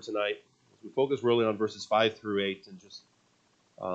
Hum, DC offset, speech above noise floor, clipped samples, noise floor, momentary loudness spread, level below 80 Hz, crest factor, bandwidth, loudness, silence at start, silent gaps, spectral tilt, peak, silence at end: none; under 0.1%; 39 dB; under 0.1%; -68 dBFS; 21 LU; -78 dBFS; 20 dB; 8 kHz; -29 LUFS; 0 s; none; -5 dB/octave; -12 dBFS; 0 s